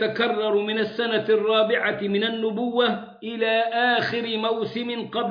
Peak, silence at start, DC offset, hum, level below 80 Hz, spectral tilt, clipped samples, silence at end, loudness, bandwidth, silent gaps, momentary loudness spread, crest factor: -8 dBFS; 0 s; under 0.1%; none; -70 dBFS; -6.5 dB/octave; under 0.1%; 0 s; -23 LUFS; 5.2 kHz; none; 7 LU; 14 dB